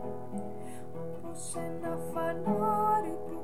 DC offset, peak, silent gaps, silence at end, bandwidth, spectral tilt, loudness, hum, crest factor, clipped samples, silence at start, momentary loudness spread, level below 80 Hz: 1%; -18 dBFS; none; 0 s; 15.5 kHz; -6 dB/octave; -34 LUFS; none; 16 dB; under 0.1%; 0 s; 14 LU; -64 dBFS